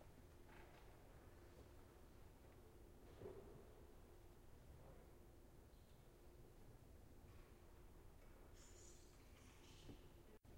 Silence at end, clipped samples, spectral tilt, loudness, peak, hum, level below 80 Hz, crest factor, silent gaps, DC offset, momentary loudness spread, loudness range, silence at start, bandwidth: 0 s; under 0.1%; -5 dB/octave; -66 LUFS; -46 dBFS; none; -68 dBFS; 18 dB; none; under 0.1%; 5 LU; 3 LU; 0 s; 16 kHz